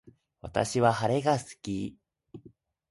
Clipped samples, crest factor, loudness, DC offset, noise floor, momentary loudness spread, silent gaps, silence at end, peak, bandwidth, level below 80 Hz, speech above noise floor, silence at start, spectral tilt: under 0.1%; 22 dB; -28 LUFS; under 0.1%; -58 dBFS; 12 LU; none; 0.4 s; -10 dBFS; 11.5 kHz; -58 dBFS; 31 dB; 0.05 s; -5.5 dB/octave